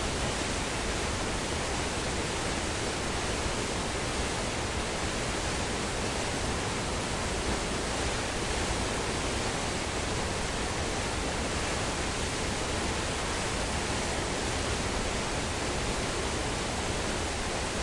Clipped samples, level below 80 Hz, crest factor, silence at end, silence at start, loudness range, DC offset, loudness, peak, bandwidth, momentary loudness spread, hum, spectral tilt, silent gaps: under 0.1%; -40 dBFS; 14 dB; 0 s; 0 s; 0 LU; under 0.1%; -31 LUFS; -18 dBFS; 11.5 kHz; 1 LU; none; -3.5 dB/octave; none